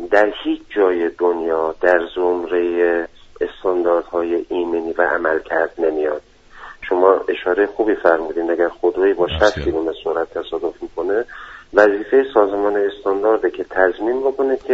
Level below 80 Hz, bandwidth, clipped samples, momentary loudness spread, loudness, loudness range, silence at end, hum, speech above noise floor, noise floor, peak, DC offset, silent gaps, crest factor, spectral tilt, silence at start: -44 dBFS; 7.8 kHz; under 0.1%; 9 LU; -18 LUFS; 2 LU; 0 s; none; 22 dB; -39 dBFS; 0 dBFS; under 0.1%; none; 18 dB; -3 dB/octave; 0 s